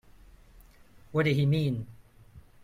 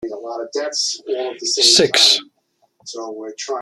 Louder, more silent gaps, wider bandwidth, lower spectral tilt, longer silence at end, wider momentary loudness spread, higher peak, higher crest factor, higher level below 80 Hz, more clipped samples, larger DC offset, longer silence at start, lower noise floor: second, -28 LUFS vs -15 LUFS; neither; second, 13 kHz vs 15 kHz; first, -8 dB/octave vs -0.5 dB/octave; first, 0.25 s vs 0 s; second, 12 LU vs 19 LU; second, -14 dBFS vs 0 dBFS; about the same, 18 dB vs 20 dB; first, -56 dBFS vs -62 dBFS; neither; neither; first, 1.1 s vs 0 s; second, -55 dBFS vs -64 dBFS